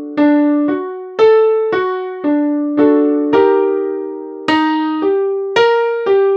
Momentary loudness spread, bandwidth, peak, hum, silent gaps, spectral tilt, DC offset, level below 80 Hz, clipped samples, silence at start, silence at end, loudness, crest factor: 8 LU; 7.2 kHz; 0 dBFS; none; none; -5.5 dB/octave; under 0.1%; -62 dBFS; under 0.1%; 0 s; 0 s; -14 LUFS; 14 dB